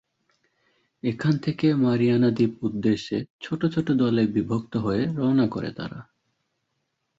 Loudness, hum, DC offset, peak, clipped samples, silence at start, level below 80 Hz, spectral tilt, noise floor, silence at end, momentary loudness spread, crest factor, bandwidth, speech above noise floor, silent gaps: -24 LUFS; none; under 0.1%; -10 dBFS; under 0.1%; 1.05 s; -58 dBFS; -8 dB/octave; -77 dBFS; 1.15 s; 11 LU; 16 dB; 7.8 kHz; 53 dB; 3.30-3.39 s